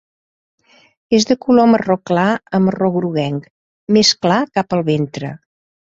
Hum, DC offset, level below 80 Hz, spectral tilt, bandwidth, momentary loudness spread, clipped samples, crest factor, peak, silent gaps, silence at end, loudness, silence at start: none; under 0.1%; -56 dBFS; -5 dB/octave; 8 kHz; 12 LU; under 0.1%; 16 dB; 0 dBFS; 3.50-3.87 s; 0.6 s; -15 LUFS; 1.1 s